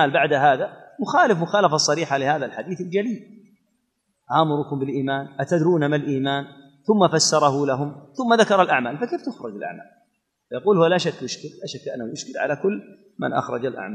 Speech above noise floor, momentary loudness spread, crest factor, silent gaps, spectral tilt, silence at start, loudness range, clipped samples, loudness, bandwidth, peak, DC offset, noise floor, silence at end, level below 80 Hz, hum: 51 dB; 15 LU; 20 dB; none; -4.5 dB/octave; 0 s; 5 LU; under 0.1%; -21 LUFS; 12 kHz; -2 dBFS; under 0.1%; -73 dBFS; 0 s; -72 dBFS; none